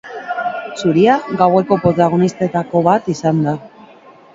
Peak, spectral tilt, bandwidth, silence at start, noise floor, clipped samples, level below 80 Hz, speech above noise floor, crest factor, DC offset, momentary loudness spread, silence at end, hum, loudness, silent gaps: 0 dBFS; -7 dB/octave; 7.8 kHz; 0.05 s; -42 dBFS; under 0.1%; -52 dBFS; 29 dB; 16 dB; under 0.1%; 9 LU; 0.5 s; none; -15 LUFS; none